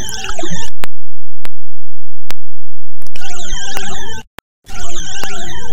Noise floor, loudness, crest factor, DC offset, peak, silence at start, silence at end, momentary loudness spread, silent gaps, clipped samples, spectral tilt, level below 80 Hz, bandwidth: -25 dBFS; -26 LUFS; 4 dB; under 0.1%; 0 dBFS; 0 s; 0 s; 16 LU; 4.27-4.62 s; 40%; -3 dB/octave; -30 dBFS; 17.5 kHz